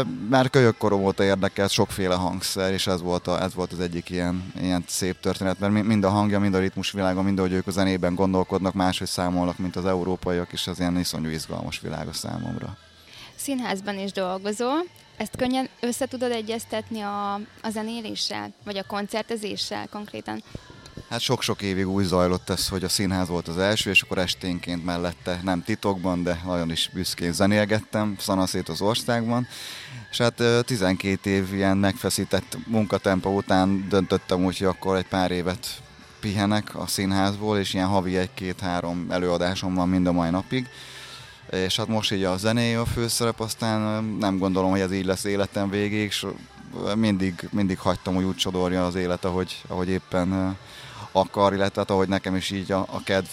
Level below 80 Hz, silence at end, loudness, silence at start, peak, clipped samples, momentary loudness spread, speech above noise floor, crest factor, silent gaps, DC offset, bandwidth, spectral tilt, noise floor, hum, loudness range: -52 dBFS; 0 s; -25 LUFS; 0 s; -6 dBFS; under 0.1%; 9 LU; 22 dB; 20 dB; none; under 0.1%; 16 kHz; -5 dB/octave; -46 dBFS; none; 6 LU